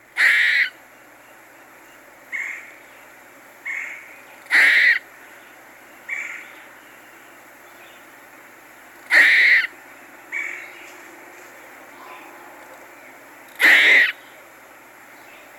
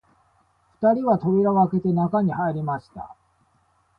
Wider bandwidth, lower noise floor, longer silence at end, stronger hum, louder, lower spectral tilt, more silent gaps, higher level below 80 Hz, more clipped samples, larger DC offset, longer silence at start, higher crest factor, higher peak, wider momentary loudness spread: first, 18 kHz vs 5.2 kHz; second, -47 dBFS vs -64 dBFS; first, 1.45 s vs 0.85 s; neither; first, -16 LUFS vs -22 LUFS; second, 0.5 dB/octave vs -11.5 dB/octave; neither; second, -76 dBFS vs -58 dBFS; neither; neither; second, 0.15 s vs 0.8 s; about the same, 20 dB vs 18 dB; first, -2 dBFS vs -6 dBFS; first, 28 LU vs 16 LU